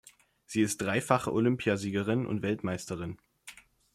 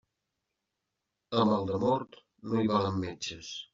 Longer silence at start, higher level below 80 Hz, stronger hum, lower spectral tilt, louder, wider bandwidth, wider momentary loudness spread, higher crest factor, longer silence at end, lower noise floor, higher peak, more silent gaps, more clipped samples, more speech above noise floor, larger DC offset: second, 0.5 s vs 1.3 s; about the same, -64 dBFS vs -68 dBFS; neither; about the same, -5.5 dB/octave vs -5.5 dB/octave; about the same, -30 LUFS vs -30 LUFS; first, 14.5 kHz vs 7.6 kHz; first, 18 LU vs 13 LU; about the same, 22 dB vs 20 dB; first, 0.4 s vs 0.1 s; second, -54 dBFS vs -85 dBFS; about the same, -10 dBFS vs -12 dBFS; neither; neither; second, 24 dB vs 55 dB; neither